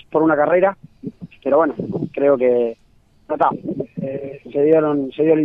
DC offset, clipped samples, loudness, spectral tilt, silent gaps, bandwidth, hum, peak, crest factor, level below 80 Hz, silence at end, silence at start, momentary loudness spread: under 0.1%; under 0.1%; -18 LUFS; -10 dB/octave; none; 3.9 kHz; none; -2 dBFS; 16 dB; -58 dBFS; 0 s; 0.1 s; 14 LU